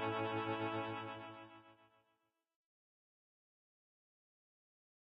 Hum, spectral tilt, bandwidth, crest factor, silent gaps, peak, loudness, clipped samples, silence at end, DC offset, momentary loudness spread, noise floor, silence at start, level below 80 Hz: none; -7.5 dB/octave; 5.4 kHz; 20 dB; none; -28 dBFS; -42 LUFS; under 0.1%; 3.3 s; under 0.1%; 18 LU; -84 dBFS; 0 s; -84 dBFS